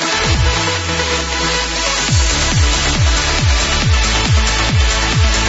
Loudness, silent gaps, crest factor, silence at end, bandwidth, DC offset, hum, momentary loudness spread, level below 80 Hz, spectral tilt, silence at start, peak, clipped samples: -14 LUFS; none; 12 dB; 0 s; 8 kHz; under 0.1%; none; 2 LU; -18 dBFS; -3 dB/octave; 0 s; -2 dBFS; under 0.1%